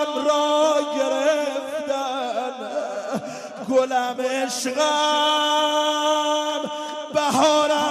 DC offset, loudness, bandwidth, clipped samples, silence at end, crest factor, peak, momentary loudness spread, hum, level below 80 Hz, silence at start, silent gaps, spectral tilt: under 0.1%; -21 LUFS; 13 kHz; under 0.1%; 0 s; 18 dB; -4 dBFS; 10 LU; none; -72 dBFS; 0 s; none; -2 dB/octave